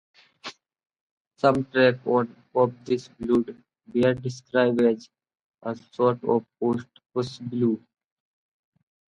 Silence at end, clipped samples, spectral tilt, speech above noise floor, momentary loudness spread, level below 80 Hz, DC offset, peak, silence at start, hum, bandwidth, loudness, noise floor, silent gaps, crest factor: 1.3 s; under 0.1%; -7 dB/octave; 20 dB; 14 LU; -62 dBFS; under 0.1%; -6 dBFS; 0.45 s; none; 9.2 kHz; -25 LUFS; -44 dBFS; 1.01-1.31 s, 5.44-5.52 s; 20 dB